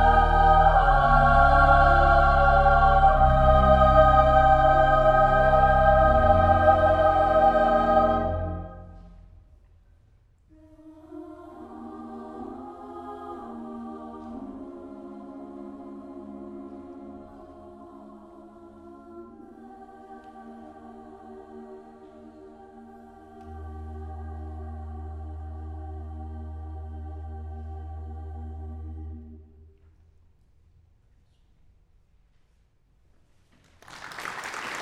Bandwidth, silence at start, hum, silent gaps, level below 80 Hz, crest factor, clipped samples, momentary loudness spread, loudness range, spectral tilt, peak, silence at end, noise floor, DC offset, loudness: 9.4 kHz; 0 s; none; none; -32 dBFS; 20 dB; under 0.1%; 24 LU; 25 LU; -7.5 dB/octave; -4 dBFS; 0 s; -63 dBFS; under 0.1%; -19 LUFS